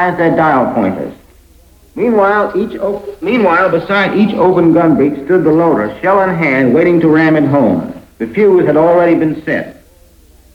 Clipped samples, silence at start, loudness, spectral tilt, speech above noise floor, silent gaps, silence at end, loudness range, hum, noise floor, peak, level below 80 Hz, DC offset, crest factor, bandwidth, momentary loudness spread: under 0.1%; 0 s; -11 LUFS; -8.5 dB/octave; 33 dB; none; 0.8 s; 4 LU; none; -43 dBFS; 0 dBFS; -44 dBFS; under 0.1%; 10 dB; 6.4 kHz; 10 LU